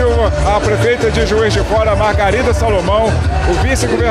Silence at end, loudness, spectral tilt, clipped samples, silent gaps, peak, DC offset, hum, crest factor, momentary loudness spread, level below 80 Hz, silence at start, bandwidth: 0 s; -13 LUFS; -5.5 dB/octave; under 0.1%; none; -2 dBFS; under 0.1%; none; 10 dB; 1 LU; -20 dBFS; 0 s; 13 kHz